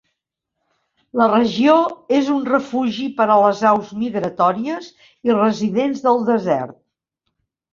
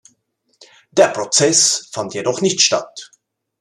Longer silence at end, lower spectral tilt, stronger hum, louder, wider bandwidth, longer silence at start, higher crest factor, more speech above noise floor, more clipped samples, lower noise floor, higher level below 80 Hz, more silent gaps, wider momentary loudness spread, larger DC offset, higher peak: first, 1 s vs 0.55 s; first, -6 dB/octave vs -2 dB/octave; neither; second, -18 LUFS vs -15 LUFS; second, 7.4 kHz vs 14 kHz; first, 1.15 s vs 0.95 s; about the same, 18 dB vs 18 dB; first, 61 dB vs 48 dB; neither; first, -79 dBFS vs -65 dBFS; about the same, -62 dBFS vs -66 dBFS; neither; about the same, 10 LU vs 12 LU; neither; about the same, -2 dBFS vs 0 dBFS